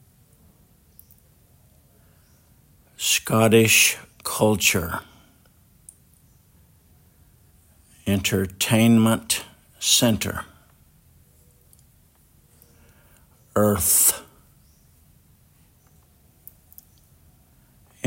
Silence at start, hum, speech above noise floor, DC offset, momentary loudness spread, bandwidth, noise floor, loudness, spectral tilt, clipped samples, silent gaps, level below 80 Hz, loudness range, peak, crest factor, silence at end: 3 s; none; 38 dB; under 0.1%; 16 LU; 16.5 kHz; -57 dBFS; -19 LUFS; -3.5 dB/octave; under 0.1%; none; -54 dBFS; 11 LU; -2 dBFS; 22 dB; 0 s